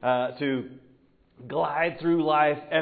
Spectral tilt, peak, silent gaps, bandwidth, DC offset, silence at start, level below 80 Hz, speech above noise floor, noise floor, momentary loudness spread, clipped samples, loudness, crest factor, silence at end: -10 dB/octave; -8 dBFS; none; 4.8 kHz; under 0.1%; 0 s; -68 dBFS; 35 dB; -60 dBFS; 10 LU; under 0.1%; -26 LUFS; 18 dB; 0 s